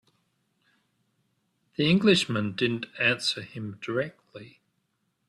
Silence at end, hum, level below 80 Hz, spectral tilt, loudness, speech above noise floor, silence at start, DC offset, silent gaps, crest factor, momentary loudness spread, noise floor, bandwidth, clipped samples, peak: 0.85 s; none; -66 dBFS; -5 dB/octave; -26 LUFS; 49 dB; 1.8 s; under 0.1%; none; 20 dB; 19 LU; -76 dBFS; 12.5 kHz; under 0.1%; -8 dBFS